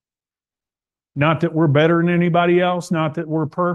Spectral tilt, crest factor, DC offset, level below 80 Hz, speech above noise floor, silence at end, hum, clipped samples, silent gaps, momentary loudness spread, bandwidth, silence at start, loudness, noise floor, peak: -7.5 dB/octave; 16 dB; under 0.1%; -60 dBFS; over 73 dB; 0 s; none; under 0.1%; none; 7 LU; 10 kHz; 1.15 s; -18 LUFS; under -90 dBFS; -4 dBFS